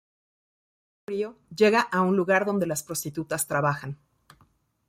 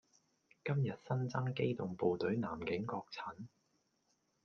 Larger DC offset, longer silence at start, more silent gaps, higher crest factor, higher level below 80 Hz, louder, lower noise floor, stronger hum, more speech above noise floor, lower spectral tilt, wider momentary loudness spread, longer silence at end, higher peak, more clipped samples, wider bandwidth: neither; first, 1.1 s vs 0.65 s; neither; about the same, 18 dB vs 18 dB; first, -66 dBFS vs -74 dBFS; first, -25 LUFS vs -39 LUFS; second, -64 dBFS vs -80 dBFS; neither; about the same, 39 dB vs 41 dB; second, -4.5 dB/octave vs -8 dB/octave; first, 13 LU vs 10 LU; about the same, 0.95 s vs 1 s; first, -8 dBFS vs -22 dBFS; neither; first, 16 kHz vs 6.8 kHz